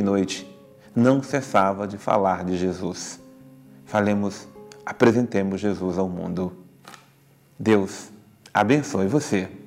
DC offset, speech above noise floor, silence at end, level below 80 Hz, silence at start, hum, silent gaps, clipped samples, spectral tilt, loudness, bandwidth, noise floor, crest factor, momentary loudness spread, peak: under 0.1%; 34 dB; 0 s; -66 dBFS; 0 s; none; none; under 0.1%; -6 dB/octave; -23 LUFS; 15 kHz; -56 dBFS; 22 dB; 13 LU; -2 dBFS